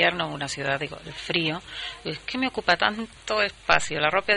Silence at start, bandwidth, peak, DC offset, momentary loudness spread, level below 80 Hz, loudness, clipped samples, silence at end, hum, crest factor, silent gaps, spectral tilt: 0 s; 10.5 kHz; -4 dBFS; under 0.1%; 11 LU; -52 dBFS; -25 LUFS; under 0.1%; 0 s; none; 22 dB; none; -3.5 dB/octave